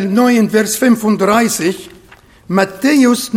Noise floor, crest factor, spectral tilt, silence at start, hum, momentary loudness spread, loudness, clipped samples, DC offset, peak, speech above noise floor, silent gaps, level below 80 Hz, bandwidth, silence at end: -43 dBFS; 12 dB; -4.5 dB/octave; 0 s; none; 7 LU; -13 LUFS; under 0.1%; under 0.1%; 0 dBFS; 31 dB; none; -52 dBFS; 16.5 kHz; 0 s